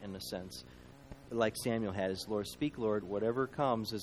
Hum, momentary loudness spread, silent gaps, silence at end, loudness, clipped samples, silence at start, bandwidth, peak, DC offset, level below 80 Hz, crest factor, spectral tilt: none; 18 LU; none; 0 s; -36 LUFS; under 0.1%; 0 s; 15.5 kHz; -16 dBFS; under 0.1%; -62 dBFS; 20 dB; -5.5 dB/octave